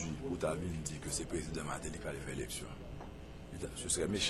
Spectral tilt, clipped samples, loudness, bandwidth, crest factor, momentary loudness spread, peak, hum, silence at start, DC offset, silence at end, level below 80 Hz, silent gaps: -3.5 dB/octave; under 0.1%; -40 LUFS; 15 kHz; 18 dB; 13 LU; -20 dBFS; none; 0 s; under 0.1%; 0 s; -50 dBFS; none